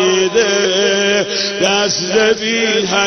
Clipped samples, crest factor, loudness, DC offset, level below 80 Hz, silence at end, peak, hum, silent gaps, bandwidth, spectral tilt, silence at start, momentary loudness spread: under 0.1%; 14 dB; -13 LUFS; under 0.1%; -52 dBFS; 0 s; 0 dBFS; none; none; 6.8 kHz; -2 dB/octave; 0 s; 2 LU